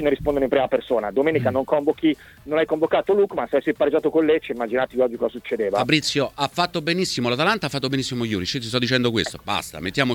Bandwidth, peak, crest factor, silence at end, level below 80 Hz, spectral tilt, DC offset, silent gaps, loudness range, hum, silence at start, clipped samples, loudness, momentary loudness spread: 18.5 kHz; -2 dBFS; 18 dB; 0 s; -50 dBFS; -5 dB/octave; under 0.1%; none; 1 LU; none; 0 s; under 0.1%; -22 LUFS; 6 LU